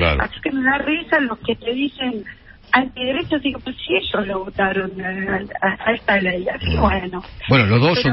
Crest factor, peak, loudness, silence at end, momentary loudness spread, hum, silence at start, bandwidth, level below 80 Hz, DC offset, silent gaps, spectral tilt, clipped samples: 18 dB; 0 dBFS; -19 LUFS; 0 s; 9 LU; none; 0 s; 5.8 kHz; -34 dBFS; under 0.1%; none; -10 dB/octave; under 0.1%